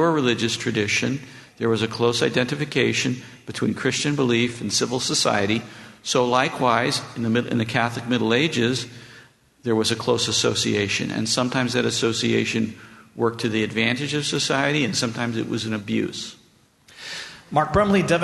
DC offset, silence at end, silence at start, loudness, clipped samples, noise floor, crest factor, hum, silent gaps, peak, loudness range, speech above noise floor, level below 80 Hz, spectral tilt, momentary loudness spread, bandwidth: under 0.1%; 0 s; 0 s; -22 LUFS; under 0.1%; -56 dBFS; 20 dB; none; none; -2 dBFS; 2 LU; 34 dB; -54 dBFS; -4 dB/octave; 10 LU; 12.5 kHz